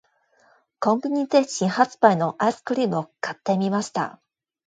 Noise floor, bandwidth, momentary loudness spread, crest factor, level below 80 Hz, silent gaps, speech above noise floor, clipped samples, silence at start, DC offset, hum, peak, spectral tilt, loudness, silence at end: -61 dBFS; 9.4 kHz; 10 LU; 22 dB; -72 dBFS; none; 39 dB; under 0.1%; 0.8 s; under 0.1%; none; 0 dBFS; -5.5 dB/octave; -23 LUFS; 0.55 s